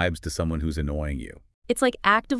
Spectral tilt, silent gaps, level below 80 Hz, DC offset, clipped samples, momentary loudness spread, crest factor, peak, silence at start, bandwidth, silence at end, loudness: -5 dB/octave; 1.54-1.62 s; -38 dBFS; under 0.1%; under 0.1%; 12 LU; 20 dB; -6 dBFS; 0 s; 12 kHz; 0 s; -26 LUFS